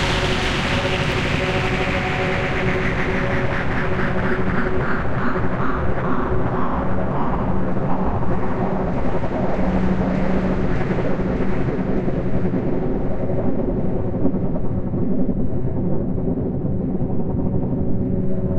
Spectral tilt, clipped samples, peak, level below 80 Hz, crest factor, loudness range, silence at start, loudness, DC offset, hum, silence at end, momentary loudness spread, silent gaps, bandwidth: -7 dB/octave; under 0.1%; -6 dBFS; -30 dBFS; 14 dB; 2 LU; 0 s; -22 LUFS; under 0.1%; none; 0 s; 3 LU; none; 10.5 kHz